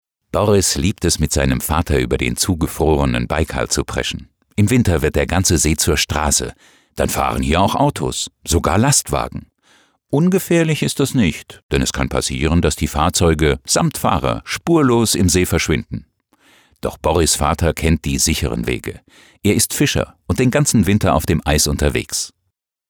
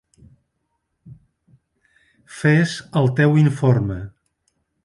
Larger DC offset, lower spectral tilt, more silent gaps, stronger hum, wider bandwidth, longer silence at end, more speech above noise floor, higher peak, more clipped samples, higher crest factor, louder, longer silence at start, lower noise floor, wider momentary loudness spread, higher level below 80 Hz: neither; second, -4.5 dB/octave vs -7.5 dB/octave; first, 11.63-11.69 s vs none; neither; first, over 20 kHz vs 11.5 kHz; second, 0.6 s vs 0.75 s; about the same, 56 dB vs 56 dB; about the same, -4 dBFS vs -4 dBFS; neither; about the same, 14 dB vs 18 dB; about the same, -17 LUFS vs -18 LUFS; second, 0.35 s vs 1.05 s; about the same, -73 dBFS vs -73 dBFS; second, 8 LU vs 17 LU; first, -30 dBFS vs -50 dBFS